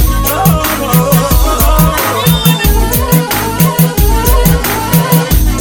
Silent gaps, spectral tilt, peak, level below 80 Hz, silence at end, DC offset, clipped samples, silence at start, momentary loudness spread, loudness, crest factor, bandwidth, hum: none; -5 dB/octave; 0 dBFS; -14 dBFS; 0 s; under 0.1%; 0.2%; 0 s; 2 LU; -10 LUFS; 10 dB; over 20 kHz; none